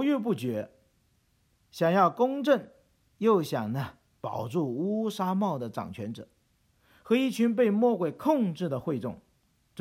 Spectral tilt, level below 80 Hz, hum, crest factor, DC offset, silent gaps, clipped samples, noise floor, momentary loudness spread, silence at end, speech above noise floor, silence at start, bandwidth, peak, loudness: -7 dB/octave; -70 dBFS; none; 20 dB; under 0.1%; none; under 0.1%; -69 dBFS; 15 LU; 0 s; 42 dB; 0 s; 16 kHz; -10 dBFS; -28 LUFS